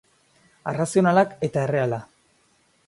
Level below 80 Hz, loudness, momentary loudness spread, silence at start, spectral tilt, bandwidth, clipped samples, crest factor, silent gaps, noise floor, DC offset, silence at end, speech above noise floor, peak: -62 dBFS; -22 LUFS; 13 LU; 0.65 s; -6.5 dB/octave; 11.5 kHz; under 0.1%; 18 dB; none; -63 dBFS; under 0.1%; 0.85 s; 42 dB; -6 dBFS